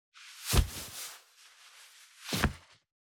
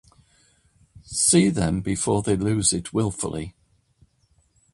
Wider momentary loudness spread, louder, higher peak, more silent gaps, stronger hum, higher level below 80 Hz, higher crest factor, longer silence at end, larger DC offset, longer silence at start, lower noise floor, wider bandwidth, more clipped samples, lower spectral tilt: first, 24 LU vs 13 LU; second, -34 LUFS vs -22 LUFS; second, -10 dBFS vs -6 dBFS; neither; neither; first, -40 dBFS vs -46 dBFS; first, 26 dB vs 20 dB; second, 0.5 s vs 1.25 s; neither; second, 0.15 s vs 0.95 s; second, -59 dBFS vs -64 dBFS; first, over 20 kHz vs 11.5 kHz; neither; about the same, -3.5 dB/octave vs -4.5 dB/octave